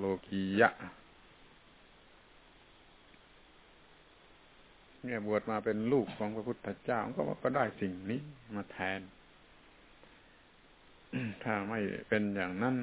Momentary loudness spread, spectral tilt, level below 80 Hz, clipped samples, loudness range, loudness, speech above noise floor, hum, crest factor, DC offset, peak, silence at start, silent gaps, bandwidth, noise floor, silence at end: 13 LU; -5 dB/octave; -66 dBFS; under 0.1%; 9 LU; -35 LUFS; 27 dB; none; 26 dB; under 0.1%; -10 dBFS; 0 s; none; 4 kHz; -62 dBFS; 0 s